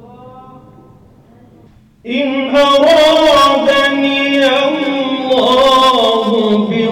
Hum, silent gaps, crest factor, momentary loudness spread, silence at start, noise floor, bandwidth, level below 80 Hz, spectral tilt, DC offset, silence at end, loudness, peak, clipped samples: none; none; 8 dB; 8 LU; 0.2 s; -44 dBFS; 18 kHz; -44 dBFS; -4 dB/octave; under 0.1%; 0 s; -10 LUFS; -4 dBFS; under 0.1%